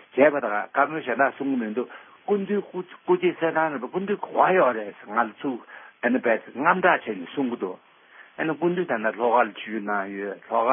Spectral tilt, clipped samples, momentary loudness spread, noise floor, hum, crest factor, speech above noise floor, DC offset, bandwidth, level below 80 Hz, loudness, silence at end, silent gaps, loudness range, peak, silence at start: -10.5 dB/octave; under 0.1%; 12 LU; -51 dBFS; none; 20 dB; 27 dB; under 0.1%; 3.7 kHz; -80 dBFS; -24 LUFS; 0 s; none; 3 LU; -4 dBFS; 0.15 s